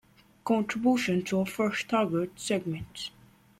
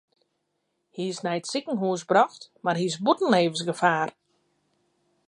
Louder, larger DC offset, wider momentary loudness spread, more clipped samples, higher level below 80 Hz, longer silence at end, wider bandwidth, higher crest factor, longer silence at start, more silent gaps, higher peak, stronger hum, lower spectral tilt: second, -29 LUFS vs -25 LUFS; neither; first, 13 LU vs 10 LU; neither; first, -62 dBFS vs -78 dBFS; second, 0.5 s vs 1.15 s; first, 16 kHz vs 11.5 kHz; second, 16 dB vs 22 dB; second, 0.45 s vs 0.95 s; neither; second, -14 dBFS vs -6 dBFS; neither; about the same, -5 dB/octave vs -4.5 dB/octave